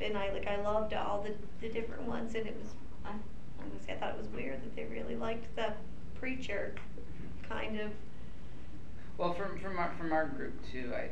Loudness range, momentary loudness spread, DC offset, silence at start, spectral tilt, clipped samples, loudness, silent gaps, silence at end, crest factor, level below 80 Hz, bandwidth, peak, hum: 4 LU; 15 LU; 2%; 0 s; -6 dB/octave; under 0.1%; -39 LUFS; none; 0 s; 18 dB; -52 dBFS; 11.5 kHz; -20 dBFS; none